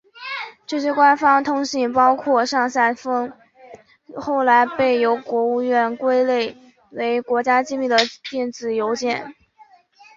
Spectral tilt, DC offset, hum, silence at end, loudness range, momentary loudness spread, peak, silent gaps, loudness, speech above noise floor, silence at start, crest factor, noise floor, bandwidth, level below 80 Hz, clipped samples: -3 dB/octave; under 0.1%; none; 0.85 s; 3 LU; 13 LU; -2 dBFS; none; -19 LUFS; 33 dB; 0.15 s; 18 dB; -52 dBFS; 7.6 kHz; -64 dBFS; under 0.1%